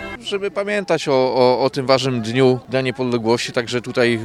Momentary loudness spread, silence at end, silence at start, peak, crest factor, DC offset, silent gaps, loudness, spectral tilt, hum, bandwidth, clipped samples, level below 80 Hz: 7 LU; 0 s; 0 s; 0 dBFS; 18 dB; under 0.1%; none; -18 LUFS; -5.5 dB/octave; none; 12.5 kHz; under 0.1%; -54 dBFS